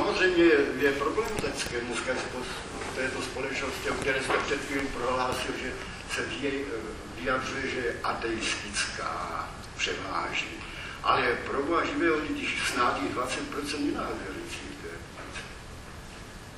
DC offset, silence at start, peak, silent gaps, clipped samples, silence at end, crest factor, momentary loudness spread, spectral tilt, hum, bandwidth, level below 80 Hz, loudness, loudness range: under 0.1%; 0 s; -10 dBFS; none; under 0.1%; 0 s; 20 dB; 13 LU; -3.5 dB/octave; none; 14 kHz; -48 dBFS; -29 LUFS; 4 LU